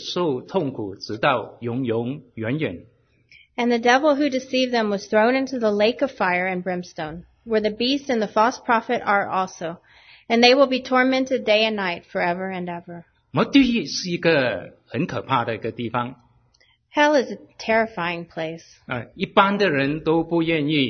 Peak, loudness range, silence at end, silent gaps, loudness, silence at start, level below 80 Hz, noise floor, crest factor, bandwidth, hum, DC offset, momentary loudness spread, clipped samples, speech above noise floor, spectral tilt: 0 dBFS; 5 LU; 0 s; none; -21 LUFS; 0 s; -58 dBFS; -61 dBFS; 20 dB; 6.6 kHz; none; under 0.1%; 14 LU; under 0.1%; 39 dB; -5 dB/octave